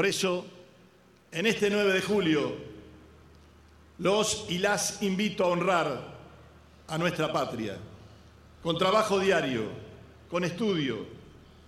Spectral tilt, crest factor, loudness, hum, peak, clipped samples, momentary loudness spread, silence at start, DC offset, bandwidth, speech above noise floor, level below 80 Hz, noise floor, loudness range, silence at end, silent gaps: -4 dB/octave; 20 dB; -28 LUFS; none; -10 dBFS; under 0.1%; 19 LU; 0 s; under 0.1%; 15.5 kHz; 31 dB; -60 dBFS; -59 dBFS; 2 LU; 0.35 s; none